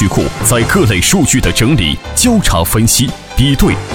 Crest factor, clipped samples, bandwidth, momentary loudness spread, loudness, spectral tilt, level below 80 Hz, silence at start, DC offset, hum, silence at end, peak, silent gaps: 10 dB; under 0.1%; 19 kHz; 4 LU; -11 LUFS; -4 dB/octave; -22 dBFS; 0 s; under 0.1%; none; 0 s; 0 dBFS; none